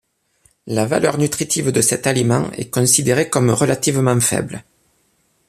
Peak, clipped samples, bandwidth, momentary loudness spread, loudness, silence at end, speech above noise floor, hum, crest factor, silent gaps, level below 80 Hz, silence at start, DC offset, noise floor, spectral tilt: -2 dBFS; under 0.1%; 15 kHz; 8 LU; -16 LUFS; 0.85 s; 45 dB; none; 16 dB; none; -52 dBFS; 0.65 s; under 0.1%; -62 dBFS; -4.5 dB/octave